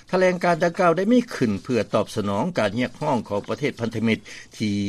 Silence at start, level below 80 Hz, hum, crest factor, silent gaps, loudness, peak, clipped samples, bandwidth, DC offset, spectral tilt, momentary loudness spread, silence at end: 0.1 s; -58 dBFS; none; 16 dB; none; -23 LUFS; -6 dBFS; under 0.1%; 13.5 kHz; under 0.1%; -6 dB/octave; 7 LU; 0 s